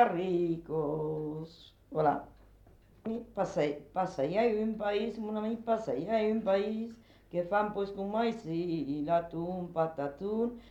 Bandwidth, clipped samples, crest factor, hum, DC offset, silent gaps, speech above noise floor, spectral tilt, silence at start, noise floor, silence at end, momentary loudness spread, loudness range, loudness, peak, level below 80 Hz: 8.4 kHz; under 0.1%; 20 dB; none; under 0.1%; none; 27 dB; -7.5 dB/octave; 0 s; -59 dBFS; 0 s; 9 LU; 3 LU; -33 LUFS; -12 dBFS; -62 dBFS